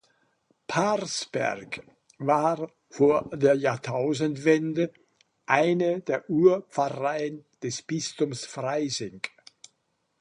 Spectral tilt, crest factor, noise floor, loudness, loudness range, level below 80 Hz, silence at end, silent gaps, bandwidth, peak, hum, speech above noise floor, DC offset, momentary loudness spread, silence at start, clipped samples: -5 dB/octave; 22 dB; -75 dBFS; -26 LUFS; 5 LU; -68 dBFS; 0.95 s; none; 11 kHz; -4 dBFS; none; 49 dB; under 0.1%; 13 LU; 0.7 s; under 0.1%